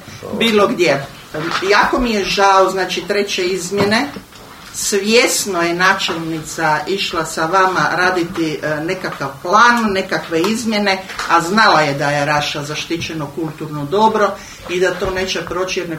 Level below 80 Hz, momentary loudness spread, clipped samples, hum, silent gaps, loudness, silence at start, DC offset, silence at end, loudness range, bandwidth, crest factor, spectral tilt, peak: -44 dBFS; 12 LU; under 0.1%; none; none; -15 LUFS; 0 s; under 0.1%; 0 s; 3 LU; 16.5 kHz; 16 dB; -3.5 dB/octave; 0 dBFS